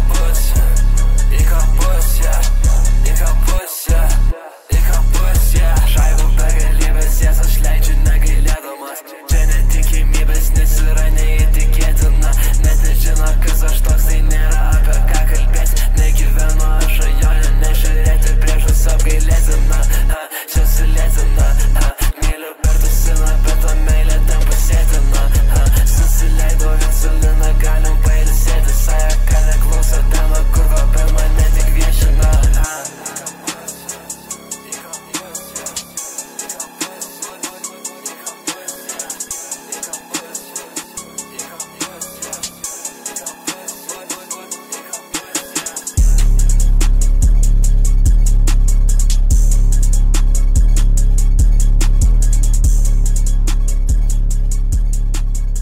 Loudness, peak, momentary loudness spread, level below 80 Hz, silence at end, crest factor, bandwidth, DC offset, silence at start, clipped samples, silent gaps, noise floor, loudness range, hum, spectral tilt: -17 LUFS; -4 dBFS; 10 LU; -12 dBFS; 0 s; 8 dB; 16.5 kHz; under 0.1%; 0 s; under 0.1%; none; -30 dBFS; 10 LU; none; -4 dB/octave